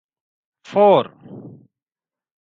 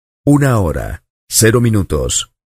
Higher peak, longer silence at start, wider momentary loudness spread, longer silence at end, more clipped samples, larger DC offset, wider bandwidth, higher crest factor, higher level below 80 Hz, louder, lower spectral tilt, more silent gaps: about the same, -2 dBFS vs 0 dBFS; first, 0.7 s vs 0.25 s; first, 25 LU vs 13 LU; first, 1.15 s vs 0.2 s; neither; neither; second, 7.2 kHz vs 15.5 kHz; first, 20 dB vs 14 dB; second, -70 dBFS vs -30 dBFS; second, -16 LUFS vs -13 LUFS; first, -7.5 dB/octave vs -5 dB/octave; second, none vs 1.10-1.27 s